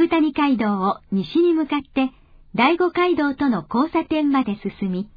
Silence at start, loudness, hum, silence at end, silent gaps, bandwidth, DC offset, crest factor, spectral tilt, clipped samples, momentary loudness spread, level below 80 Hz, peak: 0 s; -21 LUFS; none; 0.1 s; none; 5 kHz; under 0.1%; 16 dB; -8.5 dB/octave; under 0.1%; 8 LU; -52 dBFS; -4 dBFS